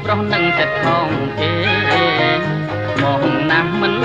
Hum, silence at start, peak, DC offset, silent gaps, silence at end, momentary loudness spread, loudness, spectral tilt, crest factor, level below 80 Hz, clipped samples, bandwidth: none; 0 s; -2 dBFS; under 0.1%; none; 0 s; 5 LU; -16 LUFS; -6.5 dB/octave; 14 dB; -46 dBFS; under 0.1%; 9 kHz